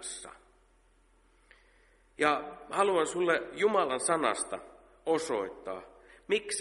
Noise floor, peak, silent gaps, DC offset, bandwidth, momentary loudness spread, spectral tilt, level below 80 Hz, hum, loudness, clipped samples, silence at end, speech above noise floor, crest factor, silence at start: -65 dBFS; -10 dBFS; none; under 0.1%; 11.5 kHz; 14 LU; -2.5 dB/octave; -66 dBFS; none; -31 LUFS; under 0.1%; 0 s; 35 dB; 22 dB; 0 s